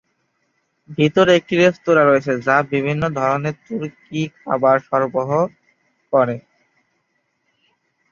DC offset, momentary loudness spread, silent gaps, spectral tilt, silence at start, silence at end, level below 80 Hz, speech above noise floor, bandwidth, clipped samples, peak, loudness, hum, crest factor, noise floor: under 0.1%; 13 LU; none; -6.5 dB/octave; 0.9 s; 1.7 s; -58 dBFS; 52 dB; 7.2 kHz; under 0.1%; -2 dBFS; -18 LUFS; none; 18 dB; -69 dBFS